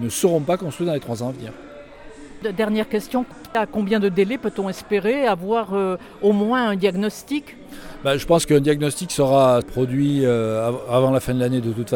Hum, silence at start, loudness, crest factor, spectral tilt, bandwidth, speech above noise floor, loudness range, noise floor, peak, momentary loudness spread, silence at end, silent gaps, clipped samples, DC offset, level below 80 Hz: none; 0 s; -21 LUFS; 16 dB; -5.5 dB/octave; 18.5 kHz; 20 dB; 5 LU; -40 dBFS; -4 dBFS; 11 LU; 0 s; none; under 0.1%; under 0.1%; -48 dBFS